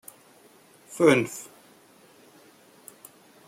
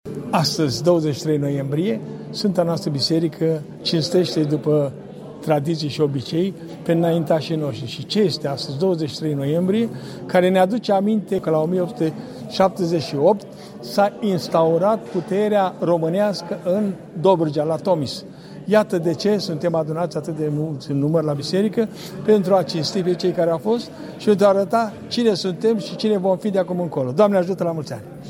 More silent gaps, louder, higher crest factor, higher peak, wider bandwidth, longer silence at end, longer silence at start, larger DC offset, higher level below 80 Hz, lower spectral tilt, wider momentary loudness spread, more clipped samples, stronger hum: neither; about the same, -22 LUFS vs -20 LUFS; first, 24 dB vs 18 dB; second, -6 dBFS vs -2 dBFS; about the same, 16.5 kHz vs 16.5 kHz; first, 2.05 s vs 0 s; first, 0.9 s vs 0.05 s; neither; second, -70 dBFS vs -60 dBFS; second, -5 dB/octave vs -6.5 dB/octave; first, 28 LU vs 8 LU; neither; neither